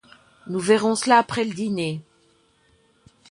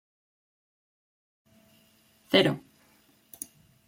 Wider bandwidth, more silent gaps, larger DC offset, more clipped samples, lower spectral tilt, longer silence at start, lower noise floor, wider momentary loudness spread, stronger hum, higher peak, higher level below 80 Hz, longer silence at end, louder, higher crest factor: second, 11.5 kHz vs 16.5 kHz; neither; neither; neither; about the same, -4.5 dB/octave vs -4.5 dB/octave; second, 0.45 s vs 2.3 s; about the same, -61 dBFS vs -63 dBFS; second, 12 LU vs 19 LU; neither; about the same, -4 dBFS vs -6 dBFS; first, -64 dBFS vs -72 dBFS; about the same, 1.3 s vs 1.3 s; first, -21 LUFS vs -25 LUFS; second, 20 dB vs 28 dB